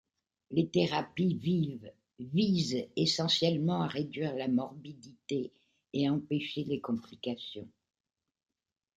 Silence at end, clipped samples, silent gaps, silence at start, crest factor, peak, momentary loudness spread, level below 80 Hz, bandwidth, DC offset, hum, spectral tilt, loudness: 1.3 s; under 0.1%; none; 0.5 s; 20 dB; -14 dBFS; 15 LU; -72 dBFS; 9.2 kHz; under 0.1%; none; -6 dB/octave; -32 LUFS